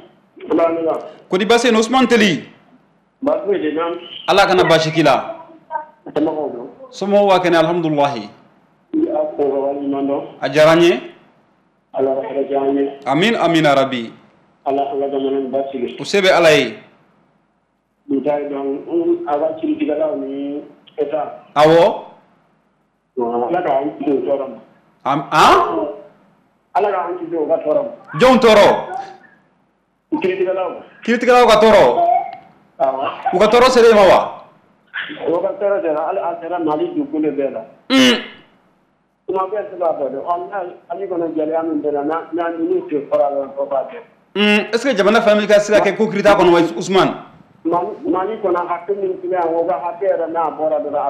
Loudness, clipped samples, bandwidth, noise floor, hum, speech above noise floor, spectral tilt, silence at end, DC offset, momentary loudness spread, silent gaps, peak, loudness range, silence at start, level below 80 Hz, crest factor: -16 LUFS; under 0.1%; 15.5 kHz; -64 dBFS; none; 48 dB; -5 dB/octave; 0 s; under 0.1%; 15 LU; none; -4 dBFS; 6 LU; 0.4 s; -50 dBFS; 12 dB